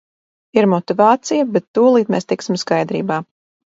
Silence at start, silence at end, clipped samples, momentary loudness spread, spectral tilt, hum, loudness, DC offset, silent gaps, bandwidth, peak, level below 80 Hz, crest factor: 0.55 s; 0.55 s; under 0.1%; 7 LU; -6 dB/octave; none; -16 LUFS; under 0.1%; 1.68-1.74 s; 8 kHz; 0 dBFS; -64 dBFS; 16 dB